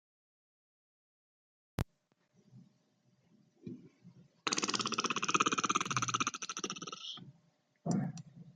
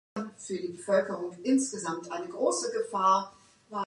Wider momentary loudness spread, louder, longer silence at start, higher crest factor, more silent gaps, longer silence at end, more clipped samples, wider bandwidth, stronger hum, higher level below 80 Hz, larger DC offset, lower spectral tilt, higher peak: first, 20 LU vs 13 LU; second, -35 LUFS vs -30 LUFS; first, 1.8 s vs 0.15 s; first, 26 dB vs 18 dB; neither; about the same, 0.05 s vs 0 s; neither; about the same, 11.5 kHz vs 11.5 kHz; neither; first, -64 dBFS vs -78 dBFS; neither; second, -2.5 dB/octave vs -4 dB/octave; about the same, -14 dBFS vs -12 dBFS